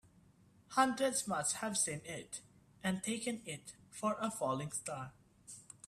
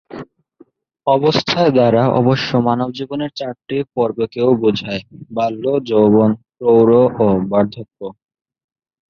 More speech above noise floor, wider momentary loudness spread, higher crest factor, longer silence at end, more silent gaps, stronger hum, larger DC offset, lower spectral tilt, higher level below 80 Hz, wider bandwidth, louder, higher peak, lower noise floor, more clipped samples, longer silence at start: second, 28 dB vs 35 dB; about the same, 16 LU vs 14 LU; first, 22 dB vs 14 dB; second, 0.25 s vs 1 s; neither; neither; neither; second, -3 dB/octave vs -7.5 dB/octave; second, -74 dBFS vs -52 dBFS; first, 15.5 kHz vs 6.8 kHz; second, -37 LUFS vs -15 LUFS; second, -18 dBFS vs -2 dBFS; first, -66 dBFS vs -50 dBFS; neither; first, 0.7 s vs 0.1 s